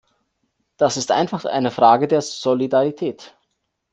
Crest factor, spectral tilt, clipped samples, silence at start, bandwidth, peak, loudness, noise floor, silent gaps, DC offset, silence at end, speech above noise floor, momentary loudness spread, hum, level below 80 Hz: 18 dB; -4.5 dB/octave; under 0.1%; 0.8 s; 9.6 kHz; -2 dBFS; -19 LUFS; -73 dBFS; none; under 0.1%; 0.65 s; 55 dB; 8 LU; none; -64 dBFS